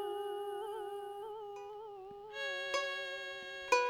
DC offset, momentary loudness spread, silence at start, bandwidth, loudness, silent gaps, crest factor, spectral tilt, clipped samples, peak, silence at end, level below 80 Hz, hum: under 0.1%; 12 LU; 0 s; 19 kHz; -41 LUFS; none; 24 dB; -1 dB/octave; under 0.1%; -16 dBFS; 0 s; -76 dBFS; none